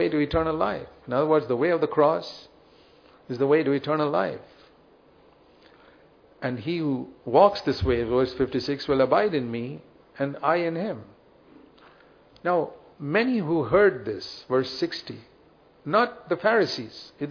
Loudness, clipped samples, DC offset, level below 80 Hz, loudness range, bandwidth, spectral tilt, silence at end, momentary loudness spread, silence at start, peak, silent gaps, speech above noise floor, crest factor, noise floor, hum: -25 LUFS; under 0.1%; under 0.1%; -50 dBFS; 6 LU; 5.4 kHz; -7 dB/octave; 0 s; 15 LU; 0 s; -4 dBFS; none; 32 dB; 22 dB; -57 dBFS; none